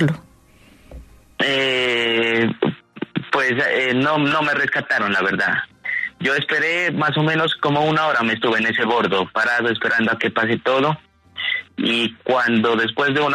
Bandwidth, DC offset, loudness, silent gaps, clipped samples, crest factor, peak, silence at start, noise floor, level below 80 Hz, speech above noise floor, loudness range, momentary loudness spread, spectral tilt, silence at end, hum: 13 kHz; under 0.1%; -19 LUFS; none; under 0.1%; 16 dB; -4 dBFS; 0 s; -50 dBFS; -56 dBFS; 31 dB; 2 LU; 6 LU; -5.5 dB/octave; 0 s; none